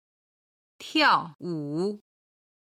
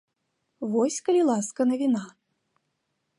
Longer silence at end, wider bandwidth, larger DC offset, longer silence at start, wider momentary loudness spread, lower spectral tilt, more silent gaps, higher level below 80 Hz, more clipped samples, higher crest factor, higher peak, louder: second, 0.8 s vs 1.1 s; first, 14.5 kHz vs 11.5 kHz; neither; first, 0.8 s vs 0.6 s; first, 19 LU vs 9 LU; about the same, -4.5 dB/octave vs -5 dB/octave; first, 1.35-1.39 s vs none; about the same, -76 dBFS vs -78 dBFS; neither; first, 20 dB vs 14 dB; first, -8 dBFS vs -12 dBFS; about the same, -26 LUFS vs -25 LUFS